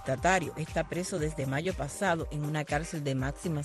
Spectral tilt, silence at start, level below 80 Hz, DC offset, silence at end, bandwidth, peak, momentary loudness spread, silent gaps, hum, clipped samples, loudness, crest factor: -5 dB/octave; 0 s; -46 dBFS; under 0.1%; 0 s; 12.5 kHz; -14 dBFS; 6 LU; none; none; under 0.1%; -32 LUFS; 18 dB